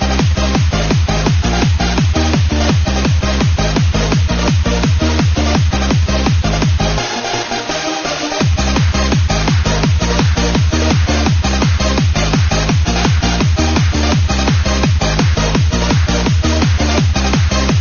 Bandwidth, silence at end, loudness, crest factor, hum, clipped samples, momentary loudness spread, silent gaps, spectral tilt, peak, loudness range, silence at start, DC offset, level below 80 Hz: 7.2 kHz; 0 s; -14 LUFS; 12 dB; none; under 0.1%; 1 LU; none; -5 dB/octave; 0 dBFS; 2 LU; 0 s; under 0.1%; -18 dBFS